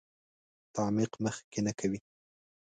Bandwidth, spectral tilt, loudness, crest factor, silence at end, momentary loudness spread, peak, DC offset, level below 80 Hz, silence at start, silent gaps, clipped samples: 9.4 kHz; -5.5 dB/octave; -34 LUFS; 20 dB; 0.8 s; 8 LU; -16 dBFS; under 0.1%; -66 dBFS; 0.75 s; 1.44-1.52 s; under 0.1%